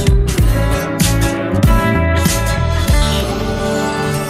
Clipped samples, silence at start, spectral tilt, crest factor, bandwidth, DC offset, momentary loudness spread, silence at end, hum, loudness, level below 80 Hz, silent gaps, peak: under 0.1%; 0 s; -5 dB/octave; 14 dB; 16 kHz; under 0.1%; 4 LU; 0 s; none; -15 LUFS; -18 dBFS; none; 0 dBFS